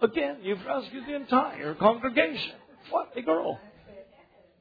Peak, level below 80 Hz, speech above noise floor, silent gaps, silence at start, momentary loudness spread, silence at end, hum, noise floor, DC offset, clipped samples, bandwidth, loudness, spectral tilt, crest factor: -6 dBFS; -64 dBFS; 31 dB; none; 0 s; 11 LU; 0.55 s; none; -59 dBFS; under 0.1%; under 0.1%; 5 kHz; -28 LUFS; -7.5 dB/octave; 22 dB